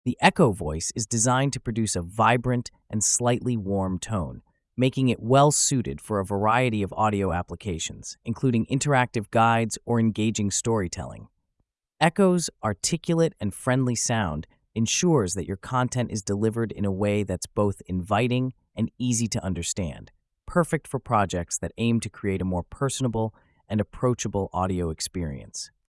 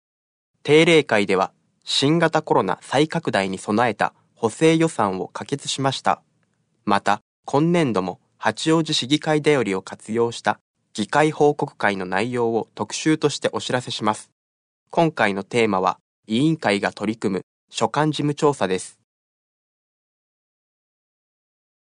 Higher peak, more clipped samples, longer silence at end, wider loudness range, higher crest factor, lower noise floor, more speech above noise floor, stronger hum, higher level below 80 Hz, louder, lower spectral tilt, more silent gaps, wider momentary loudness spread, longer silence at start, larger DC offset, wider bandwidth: about the same, -6 dBFS vs -4 dBFS; neither; second, 0.2 s vs 3 s; about the same, 4 LU vs 5 LU; about the same, 20 dB vs 18 dB; first, -76 dBFS vs -67 dBFS; first, 51 dB vs 47 dB; neither; first, -50 dBFS vs -66 dBFS; second, -25 LUFS vs -21 LUFS; about the same, -5 dB/octave vs -5 dB/octave; second, none vs 7.21-7.43 s, 10.61-10.74 s, 14.32-14.86 s, 16.01-16.23 s, 17.43-17.68 s; about the same, 10 LU vs 10 LU; second, 0.05 s vs 0.65 s; neither; first, 12 kHz vs 10.5 kHz